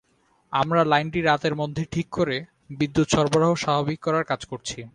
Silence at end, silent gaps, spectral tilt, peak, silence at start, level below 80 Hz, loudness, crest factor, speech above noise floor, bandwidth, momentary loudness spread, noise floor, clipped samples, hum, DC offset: 0.05 s; none; -5.5 dB/octave; -4 dBFS; 0.5 s; -52 dBFS; -23 LUFS; 18 dB; 41 dB; 11 kHz; 9 LU; -64 dBFS; under 0.1%; none; under 0.1%